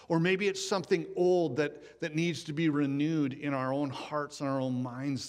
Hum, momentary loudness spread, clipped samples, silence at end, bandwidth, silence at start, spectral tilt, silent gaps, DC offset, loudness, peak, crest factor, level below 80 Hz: none; 7 LU; under 0.1%; 0 s; 13 kHz; 0 s; -6 dB/octave; none; under 0.1%; -31 LUFS; -14 dBFS; 16 dB; -72 dBFS